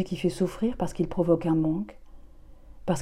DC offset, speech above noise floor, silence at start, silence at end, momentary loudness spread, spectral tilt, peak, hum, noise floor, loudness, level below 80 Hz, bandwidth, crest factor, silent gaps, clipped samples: under 0.1%; 21 dB; 0 s; 0 s; 9 LU; -7.5 dB/octave; -10 dBFS; none; -47 dBFS; -27 LUFS; -46 dBFS; 13.5 kHz; 18 dB; none; under 0.1%